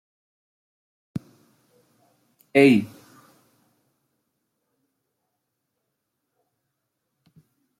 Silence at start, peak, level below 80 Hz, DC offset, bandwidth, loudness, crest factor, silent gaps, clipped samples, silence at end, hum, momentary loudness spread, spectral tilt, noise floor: 1.15 s; -4 dBFS; -72 dBFS; under 0.1%; 15 kHz; -19 LUFS; 24 dB; none; under 0.1%; 4.95 s; none; 21 LU; -6.5 dB/octave; -79 dBFS